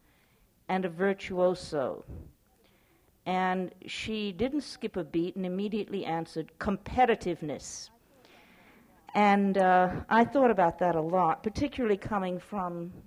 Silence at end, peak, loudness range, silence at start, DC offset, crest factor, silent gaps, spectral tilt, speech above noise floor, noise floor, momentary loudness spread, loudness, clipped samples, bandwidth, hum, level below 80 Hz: 0.05 s; -12 dBFS; 8 LU; 0.7 s; under 0.1%; 18 dB; none; -6 dB/octave; 37 dB; -65 dBFS; 13 LU; -29 LUFS; under 0.1%; 15.5 kHz; none; -56 dBFS